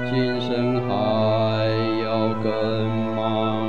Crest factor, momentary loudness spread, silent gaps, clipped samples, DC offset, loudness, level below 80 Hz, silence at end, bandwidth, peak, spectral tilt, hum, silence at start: 14 dB; 3 LU; none; under 0.1%; 2%; -22 LUFS; -58 dBFS; 0 s; 7 kHz; -8 dBFS; -8 dB/octave; none; 0 s